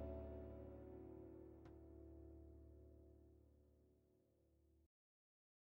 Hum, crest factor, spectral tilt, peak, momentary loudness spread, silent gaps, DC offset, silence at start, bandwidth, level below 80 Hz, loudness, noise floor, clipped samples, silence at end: none; 20 dB; -9.5 dB/octave; -40 dBFS; 12 LU; none; under 0.1%; 0 s; 16 kHz; -64 dBFS; -60 LUFS; -79 dBFS; under 0.1%; 0.9 s